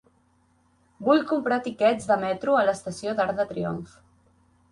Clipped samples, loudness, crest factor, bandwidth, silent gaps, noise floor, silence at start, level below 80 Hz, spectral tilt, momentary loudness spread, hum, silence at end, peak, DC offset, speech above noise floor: under 0.1%; -25 LUFS; 18 dB; 11.5 kHz; none; -64 dBFS; 1 s; -62 dBFS; -5.5 dB/octave; 9 LU; none; 0.85 s; -8 dBFS; under 0.1%; 40 dB